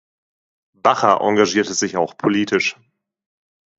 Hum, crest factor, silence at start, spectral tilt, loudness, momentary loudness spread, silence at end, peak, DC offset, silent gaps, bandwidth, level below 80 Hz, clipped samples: none; 20 dB; 0.85 s; -3.5 dB/octave; -18 LUFS; 5 LU; 1.1 s; 0 dBFS; under 0.1%; none; 8 kHz; -62 dBFS; under 0.1%